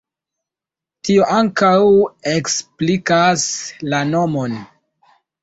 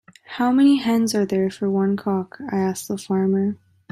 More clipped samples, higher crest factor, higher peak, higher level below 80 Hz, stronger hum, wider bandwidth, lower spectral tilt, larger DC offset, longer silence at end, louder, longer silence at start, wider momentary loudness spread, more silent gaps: neither; about the same, 14 dB vs 14 dB; first, -2 dBFS vs -8 dBFS; first, -56 dBFS vs -64 dBFS; neither; second, 8.2 kHz vs 14.5 kHz; second, -4.5 dB/octave vs -6 dB/octave; neither; first, 0.75 s vs 0.35 s; first, -16 LUFS vs -21 LUFS; first, 1.05 s vs 0.3 s; about the same, 10 LU vs 10 LU; neither